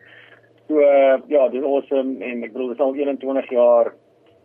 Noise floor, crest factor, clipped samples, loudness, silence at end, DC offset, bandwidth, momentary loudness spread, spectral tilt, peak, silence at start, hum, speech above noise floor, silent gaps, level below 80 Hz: -50 dBFS; 14 dB; under 0.1%; -19 LUFS; 0.55 s; under 0.1%; 3.5 kHz; 12 LU; -8 dB/octave; -6 dBFS; 0.7 s; none; 32 dB; none; -78 dBFS